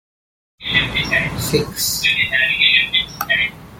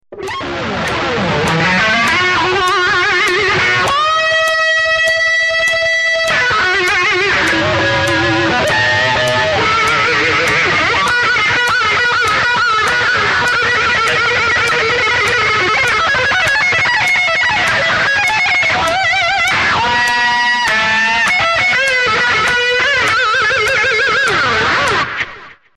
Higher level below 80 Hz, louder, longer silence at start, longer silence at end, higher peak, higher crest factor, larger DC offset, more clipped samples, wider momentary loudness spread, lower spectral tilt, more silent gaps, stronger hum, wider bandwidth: about the same, -42 dBFS vs -42 dBFS; second, -15 LUFS vs -11 LUFS; first, 0.6 s vs 0.1 s; second, 0 s vs 0.25 s; about the same, -2 dBFS vs -2 dBFS; first, 18 dB vs 12 dB; second, under 0.1% vs 0.2%; neither; first, 7 LU vs 2 LU; about the same, -2 dB/octave vs -2.5 dB/octave; neither; neither; first, 17 kHz vs 13 kHz